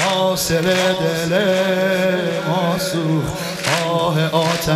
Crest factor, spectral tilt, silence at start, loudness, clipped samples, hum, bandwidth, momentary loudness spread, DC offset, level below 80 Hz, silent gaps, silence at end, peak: 14 dB; -4.5 dB/octave; 0 s; -18 LUFS; under 0.1%; none; 15.5 kHz; 4 LU; under 0.1%; -46 dBFS; none; 0 s; -4 dBFS